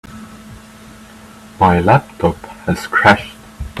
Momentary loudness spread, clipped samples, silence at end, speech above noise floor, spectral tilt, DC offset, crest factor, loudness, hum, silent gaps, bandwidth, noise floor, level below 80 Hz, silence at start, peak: 23 LU; under 0.1%; 0 s; 25 dB; -6 dB/octave; under 0.1%; 16 dB; -14 LUFS; none; none; 14 kHz; -39 dBFS; -40 dBFS; 0.1 s; 0 dBFS